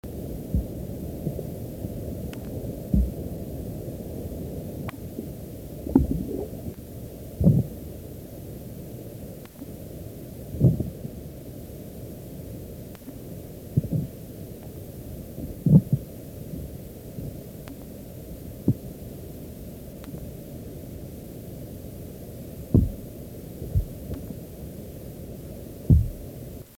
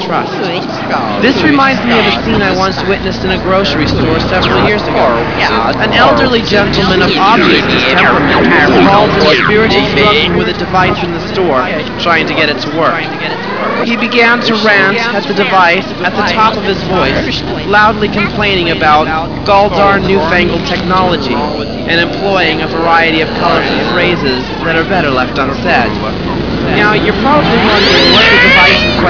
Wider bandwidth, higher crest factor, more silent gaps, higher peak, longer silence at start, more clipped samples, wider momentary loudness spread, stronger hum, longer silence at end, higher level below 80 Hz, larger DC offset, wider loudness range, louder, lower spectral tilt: first, 18 kHz vs 5.4 kHz; first, 26 dB vs 10 dB; neither; second, -4 dBFS vs 0 dBFS; about the same, 0.05 s vs 0 s; second, under 0.1% vs 0.5%; first, 17 LU vs 8 LU; neither; about the same, 0.05 s vs 0 s; second, -38 dBFS vs -30 dBFS; second, under 0.1% vs 2%; first, 8 LU vs 4 LU; second, -31 LUFS vs -9 LUFS; first, -8.5 dB/octave vs -5.5 dB/octave